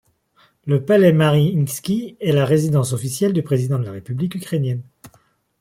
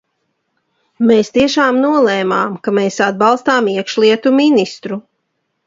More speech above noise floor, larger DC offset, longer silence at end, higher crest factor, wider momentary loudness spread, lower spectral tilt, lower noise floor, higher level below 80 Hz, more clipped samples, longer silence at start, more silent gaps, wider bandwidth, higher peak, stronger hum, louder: second, 41 dB vs 56 dB; neither; about the same, 0.55 s vs 0.65 s; about the same, 16 dB vs 14 dB; first, 11 LU vs 5 LU; first, -6.5 dB/octave vs -5 dB/octave; second, -58 dBFS vs -69 dBFS; about the same, -56 dBFS vs -56 dBFS; neither; second, 0.65 s vs 1 s; neither; first, 16 kHz vs 7.8 kHz; second, -4 dBFS vs 0 dBFS; neither; second, -19 LUFS vs -13 LUFS